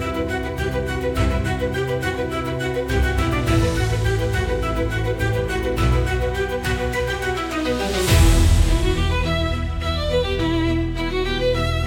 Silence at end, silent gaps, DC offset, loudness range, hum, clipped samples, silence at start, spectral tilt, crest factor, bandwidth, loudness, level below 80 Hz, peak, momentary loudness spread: 0 s; none; under 0.1%; 3 LU; none; under 0.1%; 0 s; -5.5 dB/octave; 18 dB; 17 kHz; -21 LUFS; -24 dBFS; -2 dBFS; 6 LU